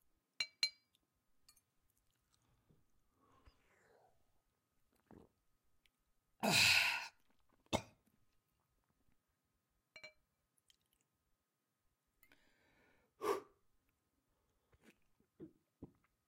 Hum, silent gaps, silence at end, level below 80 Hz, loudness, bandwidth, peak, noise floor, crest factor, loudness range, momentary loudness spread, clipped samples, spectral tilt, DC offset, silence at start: none; none; 0.45 s; -76 dBFS; -36 LUFS; 16 kHz; -18 dBFS; -88 dBFS; 28 dB; 15 LU; 25 LU; under 0.1%; -1.5 dB/octave; under 0.1%; 0.4 s